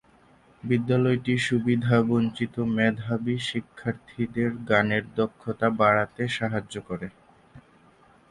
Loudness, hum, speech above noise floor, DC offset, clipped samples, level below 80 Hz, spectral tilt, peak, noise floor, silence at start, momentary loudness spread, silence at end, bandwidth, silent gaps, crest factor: -25 LUFS; none; 32 dB; under 0.1%; under 0.1%; -58 dBFS; -6.5 dB/octave; -6 dBFS; -57 dBFS; 0.65 s; 11 LU; 0.7 s; 11.5 kHz; none; 20 dB